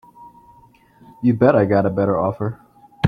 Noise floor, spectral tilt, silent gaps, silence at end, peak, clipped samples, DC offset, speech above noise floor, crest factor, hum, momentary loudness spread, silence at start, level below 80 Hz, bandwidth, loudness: -51 dBFS; -10 dB/octave; none; 0 s; 0 dBFS; under 0.1%; under 0.1%; 34 dB; 20 dB; none; 13 LU; 0.2 s; -50 dBFS; 6 kHz; -18 LUFS